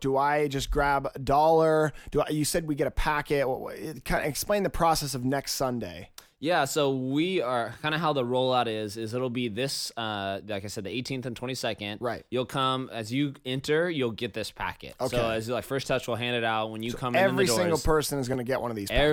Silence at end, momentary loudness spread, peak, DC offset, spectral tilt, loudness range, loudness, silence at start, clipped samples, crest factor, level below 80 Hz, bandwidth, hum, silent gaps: 0 s; 9 LU; -10 dBFS; under 0.1%; -4.5 dB/octave; 5 LU; -28 LUFS; 0 s; under 0.1%; 16 dB; -44 dBFS; 18.5 kHz; none; none